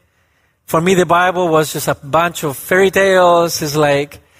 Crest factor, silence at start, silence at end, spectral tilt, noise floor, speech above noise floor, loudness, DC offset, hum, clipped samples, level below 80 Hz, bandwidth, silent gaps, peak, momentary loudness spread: 14 dB; 0.7 s; 0.25 s; -4.5 dB/octave; -59 dBFS; 46 dB; -13 LUFS; under 0.1%; none; under 0.1%; -48 dBFS; 16 kHz; none; -2 dBFS; 8 LU